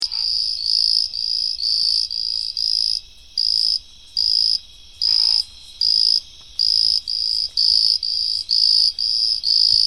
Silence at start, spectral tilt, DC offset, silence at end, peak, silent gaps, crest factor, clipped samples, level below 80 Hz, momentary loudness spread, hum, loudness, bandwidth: 0 s; 2 dB/octave; 0.4%; 0 s; -2 dBFS; none; 18 dB; under 0.1%; -52 dBFS; 7 LU; none; -16 LUFS; 15 kHz